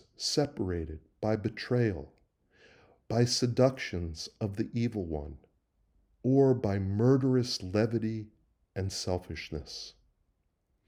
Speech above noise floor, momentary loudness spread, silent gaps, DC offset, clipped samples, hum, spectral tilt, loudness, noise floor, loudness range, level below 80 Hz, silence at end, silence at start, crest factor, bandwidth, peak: 46 dB; 15 LU; none; under 0.1%; under 0.1%; none; -6 dB/octave; -31 LUFS; -76 dBFS; 4 LU; -56 dBFS; 1 s; 0.2 s; 20 dB; 14 kHz; -12 dBFS